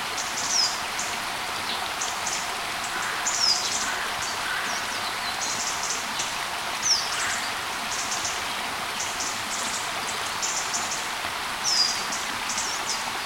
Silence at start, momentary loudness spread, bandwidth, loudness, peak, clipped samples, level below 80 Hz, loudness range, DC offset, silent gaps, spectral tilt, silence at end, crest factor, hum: 0 s; 6 LU; 16.5 kHz; -25 LUFS; -10 dBFS; under 0.1%; -56 dBFS; 2 LU; under 0.1%; none; 0.5 dB/octave; 0 s; 18 dB; none